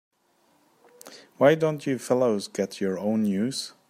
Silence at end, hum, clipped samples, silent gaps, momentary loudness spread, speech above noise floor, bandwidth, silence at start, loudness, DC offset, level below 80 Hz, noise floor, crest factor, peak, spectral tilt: 0.2 s; none; under 0.1%; none; 16 LU; 41 dB; 15.5 kHz; 1.05 s; -25 LUFS; under 0.1%; -74 dBFS; -66 dBFS; 22 dB; -6 dBFS; -5.5 dB/octave